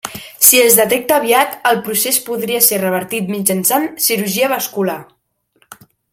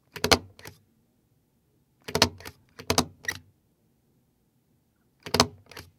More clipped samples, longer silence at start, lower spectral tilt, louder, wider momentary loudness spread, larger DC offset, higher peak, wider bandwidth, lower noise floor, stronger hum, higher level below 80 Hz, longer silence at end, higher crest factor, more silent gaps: first, 0.1% vs under 0.1%; about the same, 0.05 s vs 0.15 s; about the same, -2.5 dB/octave vs -2.5 dB/octave; first, -13 LUFS vs -26 LUFS; second, 11 LU vs 24 LU; neither; about the same, 0 dBFS vs 0 dBFS; first, over 20 kHz vs 17.5 kHz; second, -63 dBFS vs -69 dBFS; neither; second, -60 dBFS vs -54 dBFS; first, 1.1 s vs 0.15 s; second, 16 dB vs 32 dB; neither